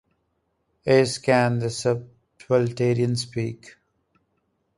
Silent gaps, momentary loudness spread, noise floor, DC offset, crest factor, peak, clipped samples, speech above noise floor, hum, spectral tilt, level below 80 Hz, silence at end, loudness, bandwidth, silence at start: none; 11 LU; -73 dBFS; under 0.1%; 20 dB; -4 dBFS; under 0.1%; 51 dB; none; -6 dB/octave; -60 dBFS; 1.1 s; -23 LUFS; 11.5 kHz; 0.85 s